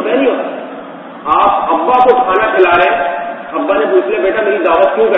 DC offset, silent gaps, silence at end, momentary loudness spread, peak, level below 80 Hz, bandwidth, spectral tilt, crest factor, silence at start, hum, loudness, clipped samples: under 0.1%; none; 0 s; 14 LU; 0 dBFS; -48 dBFS; 5 kHz; -7 dB/octave; 12 dB; 0 s; none; -11 LUFS; 0.2%